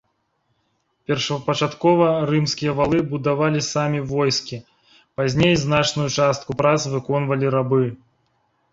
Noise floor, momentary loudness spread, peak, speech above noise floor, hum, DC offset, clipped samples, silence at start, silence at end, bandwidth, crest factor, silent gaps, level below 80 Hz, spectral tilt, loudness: -69 dBFS; 7 LU; -2 dBFS; 50 dB; none; under 0.1%; under 0.1%; 1.1 s; 0.75 s; 7.8 kHz; 18 dB; none; -50 dBFS; -5.5 dB/octave; -20 LUFS